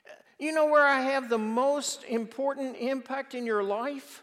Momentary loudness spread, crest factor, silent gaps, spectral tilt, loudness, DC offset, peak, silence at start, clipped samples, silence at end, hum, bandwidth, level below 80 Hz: 12 LU; 18 dB; none; -3 dB/octave; -28 LUFS; under 0.1%; -10 dBFS; 0.1 s; under 0.1%; 0.05 s; none; 15 kHz; under -90 dBFS